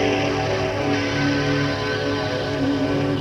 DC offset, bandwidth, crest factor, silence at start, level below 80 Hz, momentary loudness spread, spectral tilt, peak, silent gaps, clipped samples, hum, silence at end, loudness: under 0.1%; 11 kHz; 12 dB; 0 s; -42 dBFS; 2 LU; -5.5 dB/octave; -8 dBFS; none; under 0.1%; none; 0 s; -22 LUFS